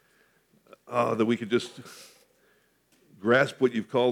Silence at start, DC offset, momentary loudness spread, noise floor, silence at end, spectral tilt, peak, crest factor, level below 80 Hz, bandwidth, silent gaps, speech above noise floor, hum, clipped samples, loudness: 0.9 s; under 0.1%; 21 LU; -66 dBFS; 0 s; -5.5 dB/octave; -8 dBFS; 20 dB; -82 dBFS; 15 kHz; none; 40 dB; none; under 0.1%; -26 LUFS